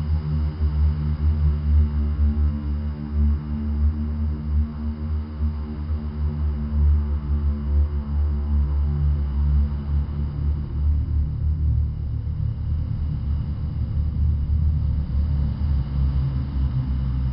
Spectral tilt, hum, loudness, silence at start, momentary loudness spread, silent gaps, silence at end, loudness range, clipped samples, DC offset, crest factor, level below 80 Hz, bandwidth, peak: -12.5 dB/octave; none; -24 LUFS; 0 s; 5 LU; none; 0 s; 3 LU; under 0.1%; under 0.1%; 12 dB; -24 dBFS; 5.2 kHz; -10 dBFS